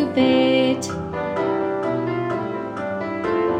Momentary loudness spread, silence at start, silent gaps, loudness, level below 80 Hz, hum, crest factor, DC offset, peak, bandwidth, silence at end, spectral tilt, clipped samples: 10 LU; 0 s; none; -22 LUFS; -52 dBFS; none; 14 dB; under 0.1%; -6 dBFS; 13.5 kHz; 0 s; -5.5 dB/octave; under 0.1%